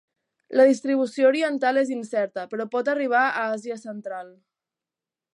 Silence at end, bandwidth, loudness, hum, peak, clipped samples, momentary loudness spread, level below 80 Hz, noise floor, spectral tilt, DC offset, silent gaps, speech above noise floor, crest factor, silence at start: 1.05 s; 11 kHz; -23 LUFS; none; -6 dBFS; under 0.1%; 15 LU; -82 dBFS; -90 dBFS; -4.5 dB/octave; under 0.1%; none; 67 dB; 18 dB; 0.5 s